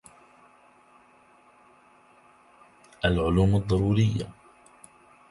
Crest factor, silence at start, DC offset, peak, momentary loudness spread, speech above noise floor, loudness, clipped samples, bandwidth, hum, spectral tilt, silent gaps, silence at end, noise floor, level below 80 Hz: 22 dB; 3.05 s; under 0.1%; -6 dBFS; 9 LU; 35 dB; -25 LUFS; under 0.1%; 11.5 kHz; none; -7.5 dB/octave; none; 1 s; -58 dBFS; -42 dBFS